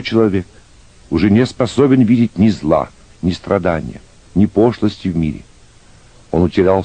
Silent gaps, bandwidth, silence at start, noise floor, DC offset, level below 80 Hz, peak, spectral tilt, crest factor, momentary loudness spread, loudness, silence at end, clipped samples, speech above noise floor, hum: none; 9.4 kHz; 0 s; -44 dBFS; under 0.1%; -38 dBFS; 0 dBFS; -7.5 dB/octave; 14 dB; 10 LU; -15 LUFS; 0 s; under 0.1%; 30 dB; none